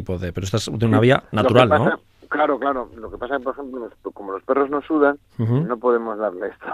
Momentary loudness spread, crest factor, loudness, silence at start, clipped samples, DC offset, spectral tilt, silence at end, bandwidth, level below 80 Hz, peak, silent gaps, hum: 16 LU; 20 dB; -20 LUFS; 0 s; under 0.1%; under 0.1%; -6.5 dB/octave; 0 s; 14 kHz; -50 dBFS; 0 dBFS; none; none